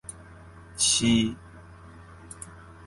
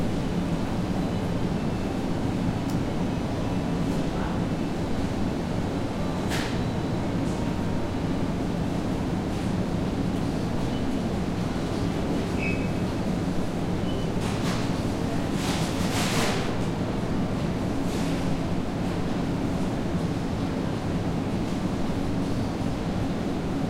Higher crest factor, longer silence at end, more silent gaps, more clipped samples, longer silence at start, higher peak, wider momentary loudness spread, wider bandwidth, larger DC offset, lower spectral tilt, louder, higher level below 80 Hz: about the same, 20 dB vs 16 dB; about the same, 0 s vs 0 s; neither; neither; about the same, 0.1 s vs 0 s; about the same, -8 dBFS vs -10 dBFS; first, 23 LU vs 2 LU; second, 11.5 kHz vs 16 kHz; neither; second, -2.5 dB/octave vs -6.5 dB/octave; first, -23 LUFS vs -28 LUFS; second, -52 dBFS vs -38 dBFS